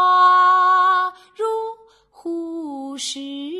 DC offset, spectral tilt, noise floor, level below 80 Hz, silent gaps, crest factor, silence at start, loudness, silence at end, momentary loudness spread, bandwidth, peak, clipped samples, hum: under 0.1%; -0.5 dB/octave; -50 dBFS; -70 dBFS; none; 12 dB; 0 s; -17 LUFS; 0 s; 17 LU; 12 kHz; -6 dBFS; under 0.1%; none